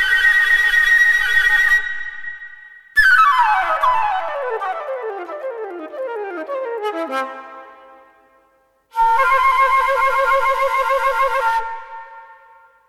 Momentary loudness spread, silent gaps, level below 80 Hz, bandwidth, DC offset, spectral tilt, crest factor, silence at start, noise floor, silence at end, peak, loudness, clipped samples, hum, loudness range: 17 LU; none; -44 dBFS; 16 kHz; under 0.1%; -1 dB/octave; 16 dB; 0 s; -59 dBFS; 0.55 s; -2 dBFS; -15 LUFS; under 0.1%; none; 13 LU